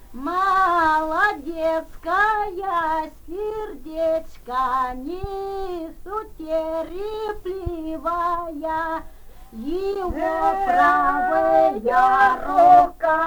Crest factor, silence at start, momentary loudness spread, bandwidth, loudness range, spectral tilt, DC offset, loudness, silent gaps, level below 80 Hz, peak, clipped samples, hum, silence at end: 18 dB; 0 s; 14 LU; over 20 kHz; 9 LU; -5.5 dB/octave; under 0.1%; -21 LUFS; none; -42 dBFS; -2 dBFS; under 0.1%; none; 0 s